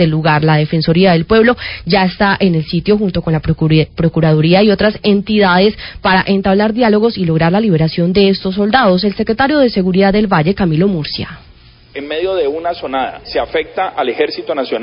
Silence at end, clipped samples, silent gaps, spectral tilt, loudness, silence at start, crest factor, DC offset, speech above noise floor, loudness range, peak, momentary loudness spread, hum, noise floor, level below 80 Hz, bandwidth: 0 s; under 0.1%; none; -11 dB/octave; -13 LUFS; 0 s; 12 dB; under 0.1%; 27 dB; 6 LU; 0 dBFS; 8 LU; none; -39 dBFS; -36 dBFS; 5.4 kHz